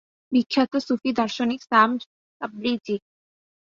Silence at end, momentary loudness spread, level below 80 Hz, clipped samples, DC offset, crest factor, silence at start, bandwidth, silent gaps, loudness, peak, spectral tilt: 0.65 s; 12 LU; -66 dBFS; under 0.1%; under 0.1%; 22 dB; 0.3 s; 7.4 kHz; 2.06-2.40 s; -23 LUFS; -2 dBFS; -5 dB/octave